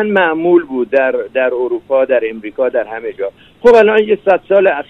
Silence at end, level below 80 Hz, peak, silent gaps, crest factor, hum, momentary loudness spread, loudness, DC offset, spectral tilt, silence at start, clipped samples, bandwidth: 0.05 s; -50 dBFS; 0 dBFS; none; 12 dB; none; 13 LU; -13 LUFS; under 0.1%; -6.5 dB/octave; 0 s; under 0.1%; 7.6 kHz